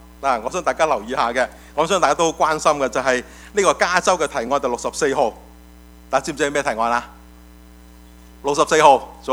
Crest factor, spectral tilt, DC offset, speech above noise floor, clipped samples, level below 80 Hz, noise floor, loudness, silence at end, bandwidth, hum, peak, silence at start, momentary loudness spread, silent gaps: 20 dB; -3 dB/octave; under 0.1%; 25 dB; under 0.1%; -46 dBFS; -44 dBFS; -19 LUFS; 0 s; over 20 kHz; none; 0 dBFS; 0.2 s; 8 LU; none